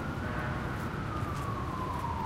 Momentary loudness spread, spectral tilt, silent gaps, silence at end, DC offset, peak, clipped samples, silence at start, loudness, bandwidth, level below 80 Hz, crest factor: 1 LU; -6.5 dB/octave; none; 0 s; under 0.1%; -22 dBFS; under 0.1%; 0 s; -35 LUFS; 16 kHz; -44 dBFS; 12 dB